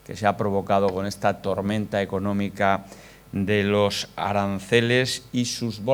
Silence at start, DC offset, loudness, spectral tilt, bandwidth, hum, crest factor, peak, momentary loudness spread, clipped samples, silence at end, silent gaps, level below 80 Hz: 0.1 s; under 0.1%; -24 LUFS; -5 dB/octave; 19 kHz; none; 20 dB; -4 dBFS; 6 LU; under 0.1%; 0 s; none; -58 dBFS